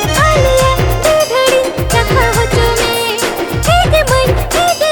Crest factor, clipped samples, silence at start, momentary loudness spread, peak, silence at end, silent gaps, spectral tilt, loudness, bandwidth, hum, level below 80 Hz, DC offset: 10 dB; under 0.1%; 0 s; 4 LU; 0 dBFS; 0 s; none; -4 dB/octave; -11 LUFS; over 20 kHz; none; -20 dBFS; under 0.1%